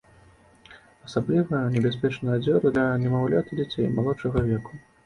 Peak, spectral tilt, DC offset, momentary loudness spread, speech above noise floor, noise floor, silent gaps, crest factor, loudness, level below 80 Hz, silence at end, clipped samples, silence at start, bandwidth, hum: -8 dBFS; -8.5 dB/octave; under 0.1%; 8 LU; 31 dB; -55 dBFS; none; 16 dB; -25 LUFS; -48 dBFS; 0.25 s; under 0.1%; 0.7 s; 10.5 kHz; none